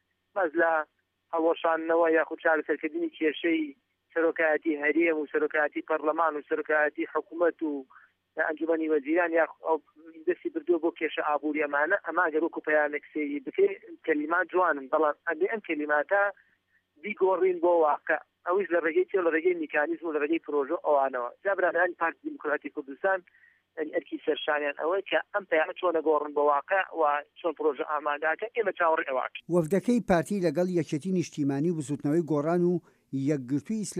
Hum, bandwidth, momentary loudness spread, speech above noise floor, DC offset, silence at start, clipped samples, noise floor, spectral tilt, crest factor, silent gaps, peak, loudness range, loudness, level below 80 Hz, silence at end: none; 12 kHz; 7 LU; 43 dB; under 0.1%; 0.35 s; under 0.1%; -70 dBFS; -6 dB/octave; 16 dB; none; -12 dBFS; 2 LU; -28 LUFS; -70 dBFS; 0 s